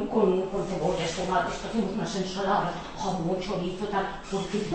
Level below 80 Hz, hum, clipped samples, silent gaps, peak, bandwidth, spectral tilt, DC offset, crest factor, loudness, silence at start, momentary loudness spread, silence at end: -46 dBFS; none; under 0.1%; none; -10 dBFS; 8.8 kHz; -5.5 dB/octave; under 0.1%; 18 dB; -29 LUFS; 0 s; 6 LU; 0 s